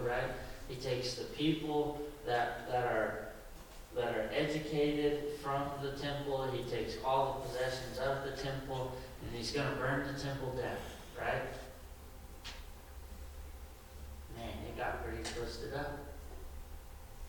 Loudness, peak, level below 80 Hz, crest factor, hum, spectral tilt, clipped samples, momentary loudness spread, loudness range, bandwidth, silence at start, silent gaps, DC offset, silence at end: -38 LUFS; -20 dBFS; -52 dBFS; 18 dB; none; -5 dB/octave; under 0.1%; 17 LU; 9 LU; 19 kHz; 0 s; none; under 0.1%; 0 s